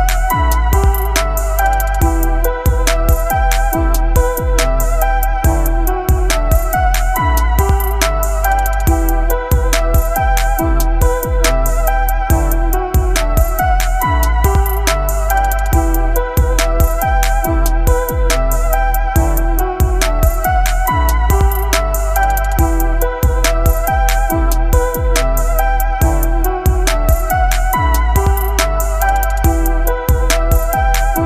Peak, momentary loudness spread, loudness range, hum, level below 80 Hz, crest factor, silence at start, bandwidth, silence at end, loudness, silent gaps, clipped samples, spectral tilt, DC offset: 0 dBFS; 2 LU; 1 LU; none; -14 dBFS; 12 dB; 0 s; 15 kHz; 0 s; -15 LUFS; none; under 0.1%; -5 dB/octave; under 0.1%